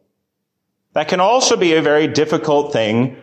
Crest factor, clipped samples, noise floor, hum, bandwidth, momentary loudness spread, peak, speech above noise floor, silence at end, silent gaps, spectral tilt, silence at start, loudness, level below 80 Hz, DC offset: 12 dB; under 0.1%; -74 dBFS; none; 9.6 kHz; 6 LU; -4 dBFS; 60 dB; 0 s; none; -4 dB/octave; 0.95 s; -15 LUFS; -60 dBFS; under 0.1%